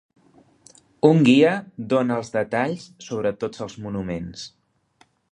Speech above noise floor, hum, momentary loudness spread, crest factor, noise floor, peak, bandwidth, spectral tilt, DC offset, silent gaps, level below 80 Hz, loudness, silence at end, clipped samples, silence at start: 40 dB; none; 18 LU; 22 dB; -61 dBFS; -2 dBFS; 9.8 kHz; -6.5 dB/octave; under 0.1%; none; -56 dBFS; -21 LUFS; 0.85 s; under 0.1%; 1.05 s